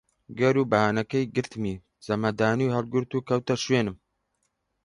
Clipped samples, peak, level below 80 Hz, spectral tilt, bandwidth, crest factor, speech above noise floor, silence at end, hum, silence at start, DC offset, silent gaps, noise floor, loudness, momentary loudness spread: under 0.1%; -6 dBFS; -58 dBFS; -6 dB/octave; 11 kHz; 20 dB; 51 dB; 0.9 s; none; 0.3 s; under 0.1%; none; -76 dBFS; -26 LUFS; 10 LU